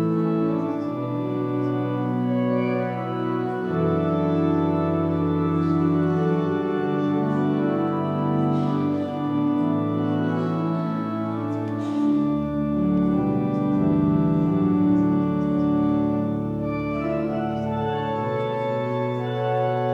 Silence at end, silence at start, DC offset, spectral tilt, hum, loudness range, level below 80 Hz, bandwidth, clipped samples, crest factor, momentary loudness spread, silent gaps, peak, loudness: 0 s; 0 s; under 0.1%; -10 dB/octave; none; 3 LU; -50 dBFS; 6 kHz; under 0.1%; 12 dB; 5 LU; none; -10 dBFS; -23 LUFS